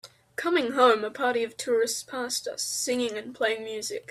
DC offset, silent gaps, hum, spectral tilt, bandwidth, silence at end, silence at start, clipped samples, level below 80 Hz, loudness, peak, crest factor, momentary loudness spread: under 0.1%; none; none; -1.5 dB/octave; 15 kHz; 0.1 s; 0.05 s; under 0.1%; -72 dBFS; -27 LUFS; -8 dBFS; 18 dB; 11 LU